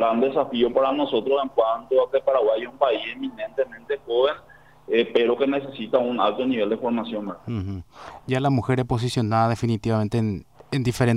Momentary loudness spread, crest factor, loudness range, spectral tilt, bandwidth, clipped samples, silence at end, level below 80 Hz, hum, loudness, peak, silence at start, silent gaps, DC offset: 10 LU; 16 dB; 3 LU; -7 dB/octave; 14.5 kHz; under 0.1%; 0 s; -52 dBFS; none; -23 LUFS; -6 dBFS; 0 s; none; 0.1%